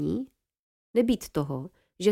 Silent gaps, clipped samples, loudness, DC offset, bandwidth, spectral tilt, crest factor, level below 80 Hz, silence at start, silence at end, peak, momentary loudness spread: 0.59-0.94 s; under 0.1%; -29 LUFS; under 0.1%; 16.5 kHz; -6.5 dB/octave; 18 dB; -54 dBFS; 0 s; 0 s; -10 dBFS; 15 LU